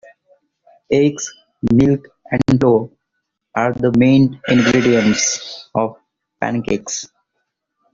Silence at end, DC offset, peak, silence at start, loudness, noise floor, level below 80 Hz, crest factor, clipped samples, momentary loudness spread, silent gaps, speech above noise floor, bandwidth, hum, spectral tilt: 0.9 s; under 0.1%; -2 dBFS; 0.9 s; -16 LUFS; -75 dBFS; -46 dBFS; 14 dB; under 0.1%; 13 LU; none; 60 dB; 7.6 kHz; none; -5 dB/octave